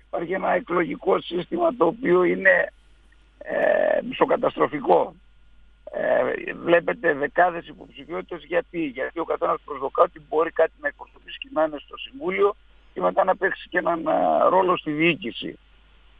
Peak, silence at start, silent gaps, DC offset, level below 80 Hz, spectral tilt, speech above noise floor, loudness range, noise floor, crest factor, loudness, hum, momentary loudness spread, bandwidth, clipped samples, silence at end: -2 dBFS; 0.15 s; none; under 0.1%; -56 dBFS; -8 dB/octave; 31 dB; 4 LU; -54 dBFS; 20 dB; -23 LUFS; none; 14 LU; 4.7 kHz; under 0.1%; 0.65 s